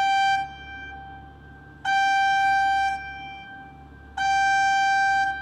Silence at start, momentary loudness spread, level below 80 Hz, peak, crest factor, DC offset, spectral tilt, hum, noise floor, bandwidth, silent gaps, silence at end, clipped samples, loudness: 0 s; 19 LU; -52 dBFS; -14 dBFS; 10 dB; under 0.1%; -1 dB/octave; none; -46 dBFS; 11.5 kHz; none; 0 s; under 0.1%; -22 LUFS